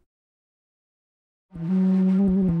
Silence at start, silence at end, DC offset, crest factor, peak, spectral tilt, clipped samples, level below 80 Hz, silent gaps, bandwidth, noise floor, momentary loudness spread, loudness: 1.55 s; 0 s; under 0.1%; 10 dB; -14 dBFS; -11.5 dB/octave; under 0.1%; -48 dBFS; none; 3.1 kHz; under -90 dBFS; 7 LU; -21 LUFS